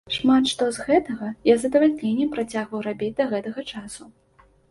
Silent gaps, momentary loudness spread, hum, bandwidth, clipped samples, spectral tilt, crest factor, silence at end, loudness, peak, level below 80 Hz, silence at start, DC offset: none; 14 LU; none; 11.5 kHz; under 0.1%; -4.5 dB/octave; 18 dB; 0.6 s; -22 LUFS; -6 dBFS; -58 dBFS; 0.05 s; under 0.1%